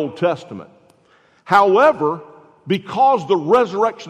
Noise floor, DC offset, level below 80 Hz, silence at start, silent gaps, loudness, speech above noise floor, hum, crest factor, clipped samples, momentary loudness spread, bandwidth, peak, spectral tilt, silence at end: -55 dBFS; under 0.1%; -64 dBFS; 0 s; none; -16 LUFS; 39 dB; none; 16 dB; under 0.1%; 15 LU; 12.5 kHz; -2 dBFS; -6 dB/octave; 0 s